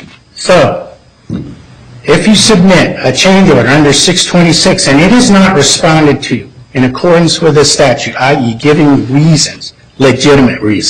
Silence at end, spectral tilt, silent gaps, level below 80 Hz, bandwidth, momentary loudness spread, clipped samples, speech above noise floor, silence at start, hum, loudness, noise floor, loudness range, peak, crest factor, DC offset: 0 s; -4.5 dB/octave; none; -32 dBFS; 13.5 kHz; 13 LU; 0.3%; 26 dB; 0 s; none; -6 LUFS; -32 dBFS; 3 LU; 0 dBFS; 8 dB; 0.8%